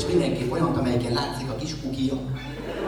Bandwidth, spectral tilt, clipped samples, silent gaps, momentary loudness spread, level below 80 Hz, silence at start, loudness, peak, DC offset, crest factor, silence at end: 18 kHz; -6 dB/octave; under 0.1%; none; 8 LU; -42 dBFS; 0 s; -26 LUFS; -10 dBFS; under 0.1%; 16 dB; 0 s